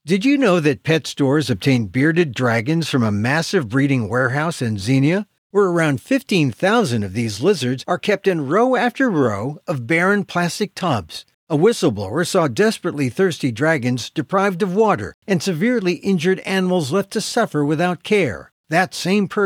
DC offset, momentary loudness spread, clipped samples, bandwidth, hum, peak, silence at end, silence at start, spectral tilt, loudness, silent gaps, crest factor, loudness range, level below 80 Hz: under 0.1%; 6 LU; under 0.1%; 16.5 kHz; none; -4 dBFS; 0 s; 0.05 s; -5.5 dB/octave; -19 LUFS; 5.38-5.50 s, 11.34-11.47 s, 15.14-15.22 s, 18.52-18.64 s; 14 dB; 1 LU; -60 dBFS